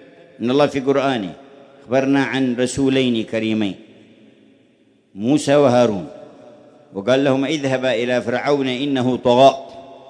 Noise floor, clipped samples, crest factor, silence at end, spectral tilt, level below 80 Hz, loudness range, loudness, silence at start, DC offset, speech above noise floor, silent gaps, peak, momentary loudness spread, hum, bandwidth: -56 dBFS; under 0.1%; 18 dB; 0.1 s; -5.5 dB/octave; -56 dBFS; 3 LU; -18 LUFS; 0.4 s; under 0.1%; 39 dB; none; 0 dBFS; 12 LU; none; 10.5 kHz